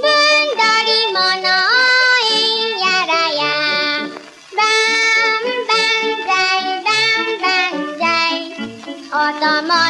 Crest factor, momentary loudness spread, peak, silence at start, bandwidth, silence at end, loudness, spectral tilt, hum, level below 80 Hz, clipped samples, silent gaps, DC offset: 12 dB; 8 LU; -4 dBFS; 0 s; 11.5 kHz; 0 s; -14 LUFS; -1 dB/octave; none; -70 dBFS; under 0.1%; none; under 0.1%